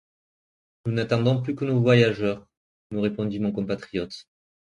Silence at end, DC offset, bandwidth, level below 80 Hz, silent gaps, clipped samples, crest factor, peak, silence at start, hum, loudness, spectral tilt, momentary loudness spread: 0.5 s; under 0.1%; 9.8 kHz; -58 dBFS; 2.57-2.90 s; under 0.1%; 20 dB; -6 dBFS; 0.85 s; none; -24 LUFS; -7.5 dB/octave; 15 LU